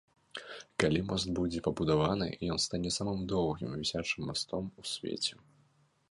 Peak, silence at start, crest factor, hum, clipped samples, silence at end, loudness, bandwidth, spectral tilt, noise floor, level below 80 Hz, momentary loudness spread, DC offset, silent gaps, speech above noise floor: -8 dBFS; 0.35 s; 26 dB; none; under 0.1%; 0.8 s; -33 LUFS; 11.5 kHz; -4.5 dB/octave; -69 dBFS; -54 dBFS; 9 LU; under 0.1%; none; 36 dB